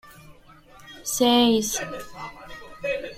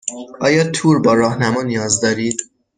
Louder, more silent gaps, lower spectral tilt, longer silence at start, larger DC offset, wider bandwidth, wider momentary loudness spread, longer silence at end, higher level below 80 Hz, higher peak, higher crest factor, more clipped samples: second, -22 LUFS vs -16 LUFS; neither; second, -2.5 dB/octave vs -4.5 dB/octave; about the same, 0.05 s vs 0.05 s; neither; first, 16 kHz vs 10 kHz; first, 23 LU vs 8 LU; second, 0 s vs 0.3 s; about the same, -52 dBFS vs -54 dBFS; second, -6 dBFS vs -2 dBFS; about the same, 20 dB vs 16 dB; neither